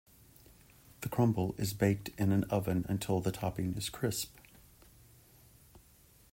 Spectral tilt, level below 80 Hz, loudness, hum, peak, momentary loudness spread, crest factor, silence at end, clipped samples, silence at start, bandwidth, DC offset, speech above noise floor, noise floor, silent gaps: -6 dB/octave; -58 dBFS; -34 LUFS; none; -16 dBFS; 7 LU; 20 dB; 0.55 s; under 0.1%; 1 s; 16.5 kHz; under 0.1%; 30 dB; -62 dBFS; none